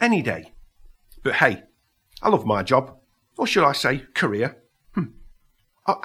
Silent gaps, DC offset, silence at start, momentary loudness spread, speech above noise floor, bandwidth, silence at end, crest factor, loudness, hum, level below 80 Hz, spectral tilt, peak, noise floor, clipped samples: none; under 0.1%; 0 s; 14 LU; 42 dB; 15.5 kHz; 0 s; 24 dB; -22 LUFS; none; -54 dBFS; -5 dB/octave; 0 dBFS; -63 dBFS; under 0.1%